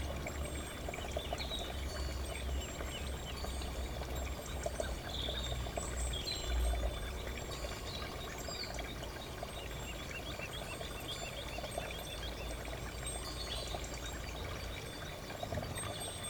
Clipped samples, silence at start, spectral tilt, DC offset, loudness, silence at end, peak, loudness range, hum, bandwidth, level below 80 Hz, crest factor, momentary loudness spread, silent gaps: under 0.1%; 0 s; -3.5 dB/octave; under 0.1%; -41 LUFS; 0 s; -24 dBFS; 3 LU; none; over 20 kHz; -44 dBFS; 18 dB; 5 LU; none